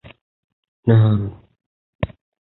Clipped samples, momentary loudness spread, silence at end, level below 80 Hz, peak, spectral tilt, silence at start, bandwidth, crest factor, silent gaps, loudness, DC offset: under 0.1%; 14 LU; 0.45 s; -44 dBFS; -2 dBFS; -13 dB/octave; 0.85 s; 4.1 kHz; 20 dB; 1.66-1.99 s; -19 LUFS; under 0.1%